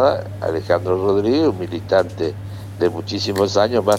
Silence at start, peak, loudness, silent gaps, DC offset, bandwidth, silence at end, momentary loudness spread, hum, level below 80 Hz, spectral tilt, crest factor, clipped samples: 0 s; -2 dBFS; -19 LUFS; none; under 0.1%; 16.5 kHz; 0 s; 9 LU; none; -50 dBFS; -6 dB/octave; 16 dB; under 0.1%